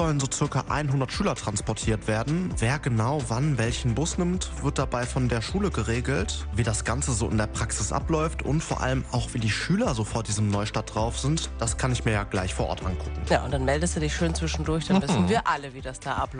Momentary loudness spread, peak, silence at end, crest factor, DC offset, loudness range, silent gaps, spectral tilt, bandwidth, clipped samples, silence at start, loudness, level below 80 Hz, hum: 4 LU; -8 dBFS; 0 s; 18 dB; under 0.1%; 1 LU; none; -5 dB/octave; 10 kHz; under 0.1%; 0 s; -26 LUFS; -36 dBFS; none